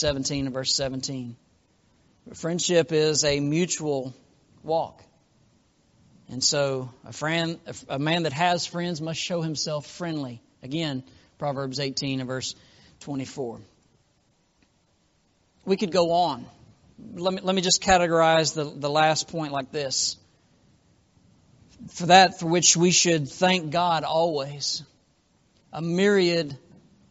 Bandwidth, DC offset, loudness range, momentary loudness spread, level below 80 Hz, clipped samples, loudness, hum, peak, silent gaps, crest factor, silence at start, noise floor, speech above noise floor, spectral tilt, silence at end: 8 kHz; under 0.1%; 10 LU; 17 LU; -56 dBFS; under 0.1%; -24 LUFS; none; -2 dBFS; none; 24 dB; 0 s; -66 dBFS; 42 dB; -3.5 dB/octave; 0.55 s